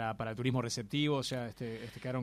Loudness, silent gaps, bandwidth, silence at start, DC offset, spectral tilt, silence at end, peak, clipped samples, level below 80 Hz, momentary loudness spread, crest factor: -36 LUFS; none; 15 kHz; 0 s; under 0.1%; -5 dB/octave; 0 s; -20 dBFS; under 0.1%; -64 dBFS; 10 LU; 16 dB